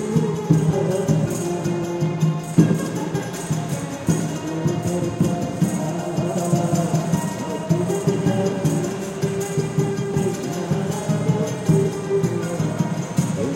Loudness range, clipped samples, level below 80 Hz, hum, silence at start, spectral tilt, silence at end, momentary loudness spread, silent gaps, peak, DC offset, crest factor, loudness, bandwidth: 2 LU; under 0.1%; -50 dBFS; none; 0 s; -6.5 dB/octave; 0 s; 5 LU; none; -2 dBFS; under 0.1%; 20 dB; -22 LUFS; 16.5 kHz